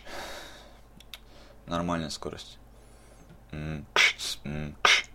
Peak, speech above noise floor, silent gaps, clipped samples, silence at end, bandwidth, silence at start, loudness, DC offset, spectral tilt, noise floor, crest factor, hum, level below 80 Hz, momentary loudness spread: -6 dBFS; 18 dB; none; under 0.1%; 0 s; 16.5 kHz; 0.05 s; -28 LUFS; under 0.1%; -2.5 dB/octave; -52 dBFS; 26 dB; none; -50 dBFS; 25 LU